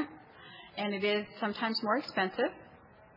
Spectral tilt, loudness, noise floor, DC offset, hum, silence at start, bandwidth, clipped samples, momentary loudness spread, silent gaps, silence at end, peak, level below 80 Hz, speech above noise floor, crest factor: -6 dB/octave; -33 LUFS; -57 dBFS; under 0.1%; none; 0 s; 5.8 kHz; under 0.1%; 20 LU; none; 0.1 s; -16 dBFS; -74 dBFS; 24 dB; 18 dB